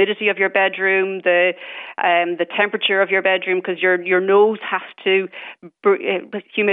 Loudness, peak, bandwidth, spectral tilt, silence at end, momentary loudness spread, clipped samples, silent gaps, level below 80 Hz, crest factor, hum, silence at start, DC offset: -18 LUFS; -4 dBFS; 3.9 kHz; -8 dB/octave; 0 s; 9 LU; under 0.1%; none; -82 dBFS; 14 dB; none; 0 s; under 0.1%